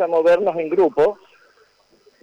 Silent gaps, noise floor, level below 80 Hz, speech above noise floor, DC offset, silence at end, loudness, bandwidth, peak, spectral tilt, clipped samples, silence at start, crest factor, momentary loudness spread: none; -57 dBFS; -62 dBFS; 40 dB; under 0.1%; 1.1 s; -18 LUFS; 7.6 kHz; -8 dBFS; -6.5 dB/octave; under 0.1%; 0 s; 10 dB; 4 LU